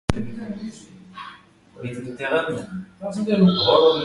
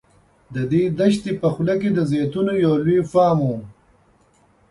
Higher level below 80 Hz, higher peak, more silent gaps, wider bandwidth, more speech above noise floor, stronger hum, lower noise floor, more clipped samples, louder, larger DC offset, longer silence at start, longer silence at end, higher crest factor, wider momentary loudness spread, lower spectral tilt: first, -44 dBFS vs -54 dBFS; first, 0 dBFS vs -4 dBFS; neither; about the same, 11.5 kHz vs 11.5 kHz; second, 27 dB vs 39 dB; neither; second, -48 dBFS vs -57 dBFS; neither; about the same, -21 LUFS vs -19 LUFS; neither; second, 0.1 s vs 0.5 s; second, 0 s vs 1 s; first, 22 dB vs 16 dB; first, 23 LU vs 7 LU; second, -6.5 dB/octave vs -8 dB/octave